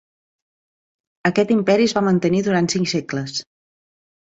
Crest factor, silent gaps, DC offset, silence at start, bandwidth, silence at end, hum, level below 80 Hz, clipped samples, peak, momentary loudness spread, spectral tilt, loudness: 20 dB; none; under 0.1%; 1.25 s; 8 kHz; 0.9 s; none; -60 dBFS; under 0.1%; -2 dBFS; 9 LU; -5.5 dB/octave; -19 LUFS